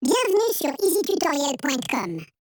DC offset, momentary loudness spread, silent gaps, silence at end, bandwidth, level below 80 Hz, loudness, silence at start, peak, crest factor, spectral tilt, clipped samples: under 0.1%; 7 LU; none; 0.25 s; 19.5 kHz; -68 dBFS; -23 LUFS; 0 s; -10 dBFS; 14 dB; -3 dB/octave; under 0.1%